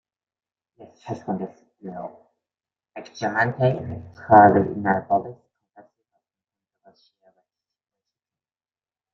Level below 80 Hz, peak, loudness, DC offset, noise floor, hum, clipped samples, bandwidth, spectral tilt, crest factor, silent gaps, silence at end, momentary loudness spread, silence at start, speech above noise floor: -62 dBFS; -2 dBFS; -20 LUFS; under 0.1%; under -90 dBFS; none; under 0.1%; 6.6 kHz; -8 dB/octave; 24 dB; none; 3.8 s; 26 LU; 0.8 s; over 69 dB